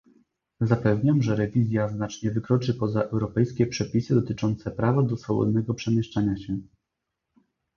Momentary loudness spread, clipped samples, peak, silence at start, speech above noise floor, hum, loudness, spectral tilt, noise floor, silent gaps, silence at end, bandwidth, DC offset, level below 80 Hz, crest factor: 6 LU; under 0.1%; -6 dBFS; 0.6 s; 59 dB; none; -25 LUFS; -7.5 dB/octave; -83 dBFS; none; 1.1 s; 7 kHz; under 0.1%; -52 dBFS; 20 dB